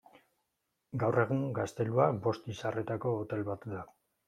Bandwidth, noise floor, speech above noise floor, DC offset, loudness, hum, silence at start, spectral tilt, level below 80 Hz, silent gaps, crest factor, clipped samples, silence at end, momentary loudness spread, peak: 12 kHz; -83 dBFS; 51 dB; under 0.1%; -33 LUFS; none; 0.95 s; -7.5 dB/octave; -70 dBFS; none; 22 dB; under 0.1%; 0.45 s; 13 LU; -12 dBFS